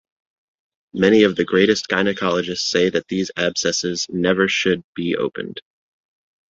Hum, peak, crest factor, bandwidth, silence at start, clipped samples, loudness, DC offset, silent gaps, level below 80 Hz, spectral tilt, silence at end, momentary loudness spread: none; -2 dBFS; 18 dB; 8 kHz; 0.95 s; under 0.1%; -19 LUFS; under 0.1%; 4.84-4.93 s; -56 dBFS; -4 dB/octave; 0.9 s; 9 LU